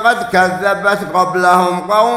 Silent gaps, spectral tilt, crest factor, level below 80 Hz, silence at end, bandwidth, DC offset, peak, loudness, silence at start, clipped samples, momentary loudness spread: none; -4.5 dB/octave; 12 dB; -52 dBFS; 0 s; 16 kHz; under 0.1%; 0 dBFS; -13 LUFS; 0 s; under 0.1%; 4 LU